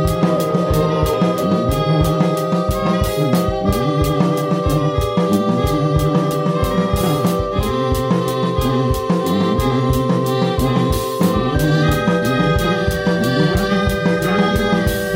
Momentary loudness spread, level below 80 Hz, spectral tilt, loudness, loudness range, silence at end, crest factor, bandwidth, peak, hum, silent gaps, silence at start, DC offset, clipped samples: 2 LU; -28 dBFS; -6.5 dB/octave; -17 LUFS; 1 LU; 0 s; 16 dB; 16.5 kHz; -2 dBFS; none; none; 0 s; under 0.1%; under 0.1%